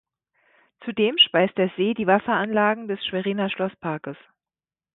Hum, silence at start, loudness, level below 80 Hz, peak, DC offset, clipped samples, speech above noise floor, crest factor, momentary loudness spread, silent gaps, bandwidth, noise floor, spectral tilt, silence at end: none; 0.8 s; -22 LUFS; -66 dBFS; -4 dBFS; under 0.1%; under 0.1%; over 68 dB; 20 dB; 14 LU; none; 4.1 kHz; under -90 dBFS; -9.5 dB/octave; 0.8 s